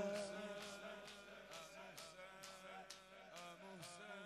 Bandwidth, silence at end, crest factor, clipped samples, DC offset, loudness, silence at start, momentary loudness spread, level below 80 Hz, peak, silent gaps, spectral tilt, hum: 14 kHz; 0 s; 20 dB; under 0.1%; under 0.1%; -54 LUFS; 0 s; 7 LU; -82 dBFS; -34 dBFS; none; -3 dB/octave; none